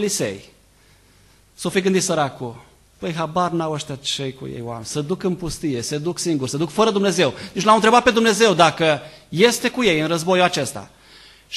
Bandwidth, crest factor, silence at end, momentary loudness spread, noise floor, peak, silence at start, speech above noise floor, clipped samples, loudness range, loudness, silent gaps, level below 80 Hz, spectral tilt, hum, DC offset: 13 kHz; 20 dB; 0 s; 15 LU; -53 dBFS; 0 dBFS; 0 s; 34 dB; under 0.1%; 8 LU; -19 LUFS; none; -52 dBFS; -4 dB/octave; none; under 0.1%